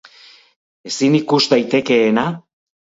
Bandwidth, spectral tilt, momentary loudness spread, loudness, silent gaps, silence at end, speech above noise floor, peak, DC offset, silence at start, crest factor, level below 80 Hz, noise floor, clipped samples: 8 kHz; -5 dB/octave; 10 LU; -16 LUFS; none; 0.55 s; 31 dB; 0 dBFS; under 0.1%; 0.85 s; 18 dB; -62 dBFS; -46 dBFS; under 0.1%